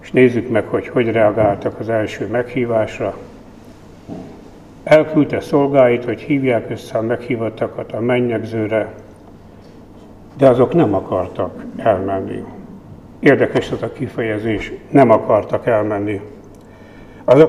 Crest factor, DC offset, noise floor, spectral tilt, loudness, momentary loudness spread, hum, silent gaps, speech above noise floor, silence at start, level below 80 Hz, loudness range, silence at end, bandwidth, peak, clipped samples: 16 dB; 0.1%; -40 dBFS; -8 dB/octave; -17 LUFS; 15 LU; none; none; 24 dB; 0.05 s; -46 dBFS; 5 LU; 0 s; 12 kHz; 0 dBFS; under 0.1%